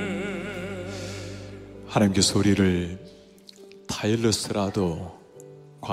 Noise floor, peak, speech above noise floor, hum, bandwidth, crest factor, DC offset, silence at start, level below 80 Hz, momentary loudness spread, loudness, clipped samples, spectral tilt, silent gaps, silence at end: -49 dBFS; -2 dBFS; 26 dB; none; 15.5 kHz; 24 dB; under 0.1%; 0 s; -52 dBFS; 25 LU; -25 LUFS; under 0.1%; -4.5 dB/octave; none; 0 s